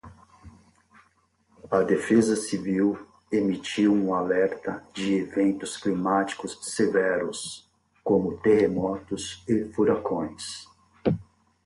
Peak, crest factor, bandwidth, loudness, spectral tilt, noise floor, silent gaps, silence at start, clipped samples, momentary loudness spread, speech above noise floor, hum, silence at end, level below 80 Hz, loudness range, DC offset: -8 dBFS; 18 dB; 11.5 kHz; -26 LUFS; -5.5 dB/octave; -66 dBFS; none; 0.05 s; under 0.1%; 12 LU; 41 dB; none; 0.4 s; -58 dBFS; 2 LU; under 0.1%